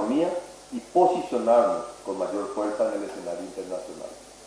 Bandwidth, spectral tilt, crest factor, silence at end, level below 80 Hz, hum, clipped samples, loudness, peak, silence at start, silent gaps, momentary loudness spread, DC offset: 11 kHz; -5 dB/octave; 18 dB; 0 s; -62 dBFS; 50 Hz at -60 dBFS; under 0.1%; -26 LUFS; -8 dBFS; 0 s; none; 16 LU; under 0.1%